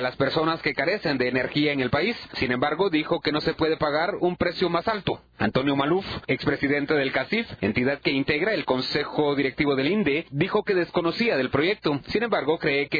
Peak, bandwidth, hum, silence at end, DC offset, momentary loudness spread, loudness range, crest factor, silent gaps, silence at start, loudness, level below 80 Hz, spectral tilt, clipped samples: -8 dBFS; 5 kHz; none; 0 s; under 0.1%; 3 LU; 1 LU; 16 dB; none; 0 s; -24 LUFS; -52 dBFS; -7.5 dB/octave; under 0.1%